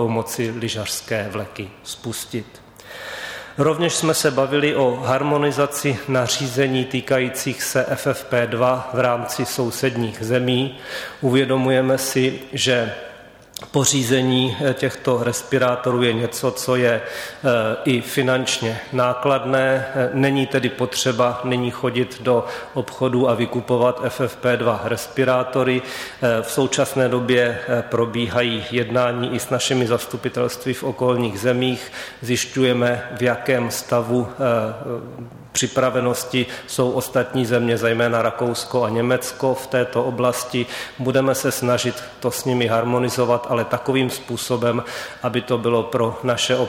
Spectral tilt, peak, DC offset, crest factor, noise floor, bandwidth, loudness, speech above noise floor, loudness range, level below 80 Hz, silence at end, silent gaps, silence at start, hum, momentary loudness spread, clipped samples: -4.5 dB/octave; -4 dBFS; under 0.1%; 16 dB; -42 dBFS; 17 kHz; -20 LUFS; 22 dB; 2 LU; -56 dBFS; 0 s; none; 0 s; none; 8 LU; under 0.1%